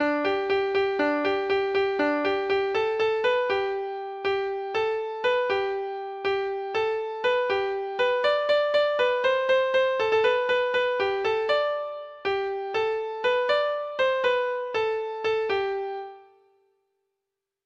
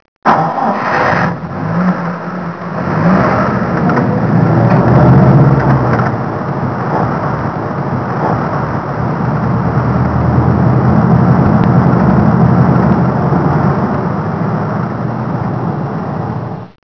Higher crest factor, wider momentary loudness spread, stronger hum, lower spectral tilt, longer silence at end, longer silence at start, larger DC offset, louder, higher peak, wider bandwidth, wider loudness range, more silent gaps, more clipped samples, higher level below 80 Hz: about the same, 14 dB vs 12 dB; about the same, 7 LU vs 9 LU; neither; second, -4 dB/octave vs -10 dB/octave; first, 1.45 s vs 0.2 s; second, 0 s vs 0.25 s; second, under 0.1% vs 0.6%; second, -25 LUFS vs -12 LUFS; second, -12 dBFS vs 0 dBFS; first, 7.6 kHz vs 5.4 kHz; about the same, 4 LU vs 6 LU; neither; second, under 0.1% vs 0.2%; second, -64 dBFS vs -32 dBFS